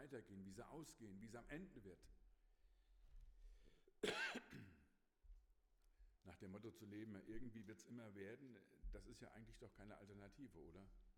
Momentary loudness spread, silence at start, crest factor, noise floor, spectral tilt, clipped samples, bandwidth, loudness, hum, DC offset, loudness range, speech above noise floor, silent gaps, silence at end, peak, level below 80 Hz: 15 LU; 0 s; 26 dB; -77 dBFS; -4.5 dB/octave; under 0.1%; 17 kHz; -56 LUFS; none; under 0.1%; 7 LU; 21 dB; none; 0 s; -32 dBFS; -68 dBFS